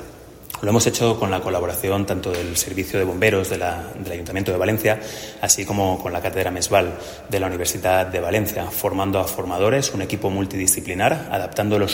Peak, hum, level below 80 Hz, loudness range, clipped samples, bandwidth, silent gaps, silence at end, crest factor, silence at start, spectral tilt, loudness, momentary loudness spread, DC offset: -2 dBFS; none; -48 dBFS; 1 LU; under 0.1%; 16.5 kHz; none; 0 s; 20 dB; 0 s; -4 dB/octave; -21 LUFS; 8 LU; under 0.1%